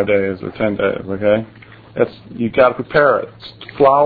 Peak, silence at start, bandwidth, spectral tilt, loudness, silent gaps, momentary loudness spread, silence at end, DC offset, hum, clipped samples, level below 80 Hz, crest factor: 0 dBFS; 0 s; 4.9 kHz; -9.5 dB/octave; -17 LUFS; none; 18 LU; 0 s; under 0.1%; none; under 0.1%; -48 dBFS; 16 dB